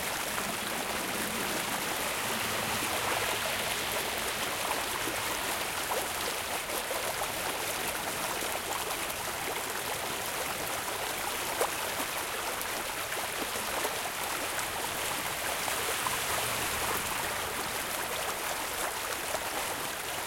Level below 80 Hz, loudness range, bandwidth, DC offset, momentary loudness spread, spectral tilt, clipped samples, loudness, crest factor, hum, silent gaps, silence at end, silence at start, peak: -58 dBFS; 2 LU; 17 kHz; under 0.1%; 3 LU; -1 dB/octave; under 0.1%; -31 LUFS; 20 dB; none; none; 0 s; 0 s; -14 dBFS